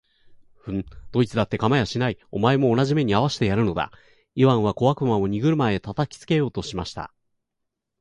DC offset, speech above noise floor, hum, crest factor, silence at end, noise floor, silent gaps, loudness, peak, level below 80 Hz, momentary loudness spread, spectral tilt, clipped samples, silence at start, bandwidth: under 0.1%; 58 dB; none; 18 dB; 0.95 s; -80 dBFS; none; -23 LUFS; -4 dBFS; -48 dBFS; 12 LU; -7 dB/octave; under 0.1%; 0.3 s; 11 kHz